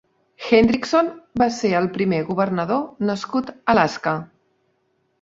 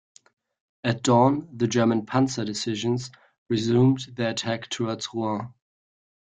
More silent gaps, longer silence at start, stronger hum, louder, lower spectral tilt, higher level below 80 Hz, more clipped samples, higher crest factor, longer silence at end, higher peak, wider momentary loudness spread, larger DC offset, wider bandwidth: second, none vs 3.38-3.46 s; second, 0.4 s vs 0.85 s; neither; first, -20 LUFS vs -25 LUFS; about the same, -6 dB/octave vs -5.5 dB/octave; first, -50 dBFS vs -62 dBFS; neither; about the same, 20 dB vs 20 dB; about the same, 0.95 s vs 0.85 s; first, -2 dBFS vs -6 dBFS; about the same, 9 LU vs 10 LU; neither; second, 7.8 kHz vs 9.4 kHz